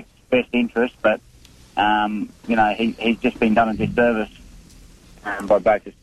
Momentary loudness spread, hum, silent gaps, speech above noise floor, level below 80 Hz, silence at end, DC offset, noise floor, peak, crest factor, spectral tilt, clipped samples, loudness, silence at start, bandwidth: 11 LU; none; none; 27 dB; -46 dBFS; 0.1 s; under 0.1%; -46 dBFS; -6 dBFS; 14 dB; -6 dB/octave; under 0.1%; -20 LUFS; 0 s; 12.5 kHz